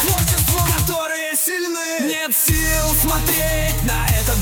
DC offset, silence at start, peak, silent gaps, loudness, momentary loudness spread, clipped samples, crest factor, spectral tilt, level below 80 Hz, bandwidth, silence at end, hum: under 0.1%; 0 s; -4 dBFS; none; -17 LUFS; 5 LU; under 0.1%; 14 dB; -3.5 dB/octave; -26 dBFS; over 20 kHz; 0 s; none